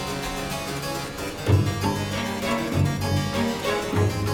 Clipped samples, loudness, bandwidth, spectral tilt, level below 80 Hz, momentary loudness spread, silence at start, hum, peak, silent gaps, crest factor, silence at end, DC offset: under 0.1%; -25 LUFS; 17.5 kHz; -5.5 dB/octave; -42 dBFS; 7 LU; 0 s; none; -8 dBFS; none; 16 dB; 0 s; under 0.1%